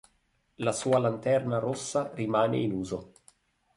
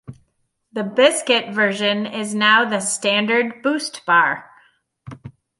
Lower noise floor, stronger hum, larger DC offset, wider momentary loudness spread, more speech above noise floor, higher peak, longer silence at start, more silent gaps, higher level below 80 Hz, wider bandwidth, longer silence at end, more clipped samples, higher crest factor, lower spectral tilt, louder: about the same, -71 dBFS vs -68 dBFS; neither; neither; second, 7 LU vs 13 LU; second, 43 dB vs 50 dB; second, -12 dBFS vs -2 dBFS; first, 0.6 s vs 0.1 s; neither; about the same, -62 dBFS vs -64 dBFS; about the same, 11.5 kHz vs 11.5 kHz; first, 0.7 s vs 0.3 s; neither; about the same, 16 dB vs 18 dB; first, -5.5 dB/octave vs -2.5 dB/octave; second, -29 LUFS vs -18 LUFS